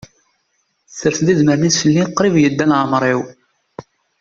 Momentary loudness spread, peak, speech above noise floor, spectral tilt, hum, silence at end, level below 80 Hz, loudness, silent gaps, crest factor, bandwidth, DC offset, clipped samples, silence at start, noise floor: 8 LU; -2 dBFS; 52 dB; -5 dB/octave; none; 0.4 s; -54 dBFS; -15 LUFS; none; 14 dB; 7.6 kHz; under 0.1%; under 0.1%; 0.9 s; -66 dBFS